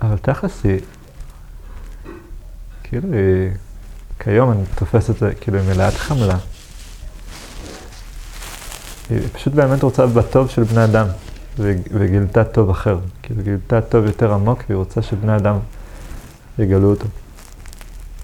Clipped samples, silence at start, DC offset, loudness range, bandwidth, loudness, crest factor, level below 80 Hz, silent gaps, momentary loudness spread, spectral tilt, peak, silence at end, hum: under 0.1%; 0 s; under 0.1%; 8 LU; 15 kHz; -17 LUFS; 18 dB; -32 dBFS; none; 23 LU; -8 dB/octave; 0 dBFS; 0 s; none